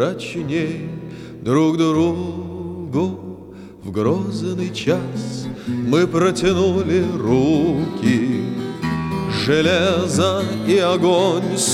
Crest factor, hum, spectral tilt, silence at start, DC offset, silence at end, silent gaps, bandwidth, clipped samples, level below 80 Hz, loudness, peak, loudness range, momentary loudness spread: 16 dB; none; -5.5 dB/octave; 0 s; under 0.1%; 0 s; none; 15 kHz; under 0.1%; -50 dBFS; -19 LUFS; -4 dBFS; 5 LU; 13 LU